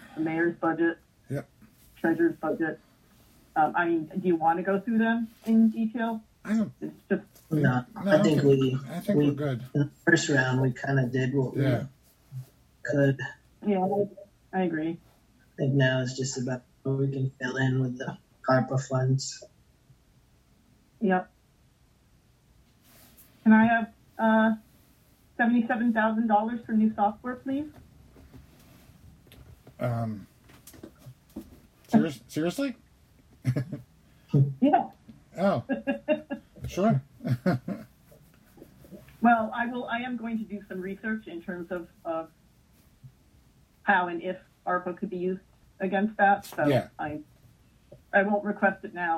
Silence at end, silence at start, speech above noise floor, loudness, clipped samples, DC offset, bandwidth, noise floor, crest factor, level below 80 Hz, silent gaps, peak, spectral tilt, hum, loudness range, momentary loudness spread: 0 s; 0 s; 36 dB; -27 LUFS; under 0.1%; under 0.1%; 15 kHz; -62 dBFS; 22 dB; -62 dBFS; none; -8 dBFS; -6.5 dB/octave; none; 9 LU; 15 LU